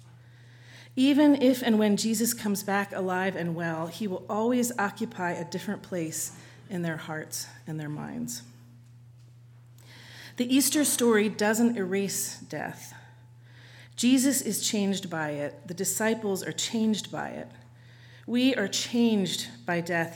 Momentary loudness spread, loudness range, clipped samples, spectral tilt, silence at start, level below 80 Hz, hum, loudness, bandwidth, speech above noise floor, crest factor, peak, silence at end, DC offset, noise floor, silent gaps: 14 LU; 9 LU; under 0.1%; -4 dB/octave; 0.05 s; -74 dBFS; none; -27 LUFS; 19 kHz; 25 dB; 18 dB; -10 dBFS; 0 s; under 0.1%; -52 dBFS; none